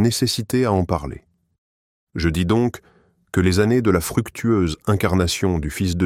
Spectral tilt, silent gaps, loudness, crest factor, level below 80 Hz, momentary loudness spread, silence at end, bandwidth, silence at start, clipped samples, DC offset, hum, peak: -5.5 dB/octave; 1.58-2.07 s; -20 LUFS; 16 dB; -38 dBFS; 7 LU; 0 s; 16.5 kHz; 0 s; under 0.1%; under 0.1%; none; -4 dBFS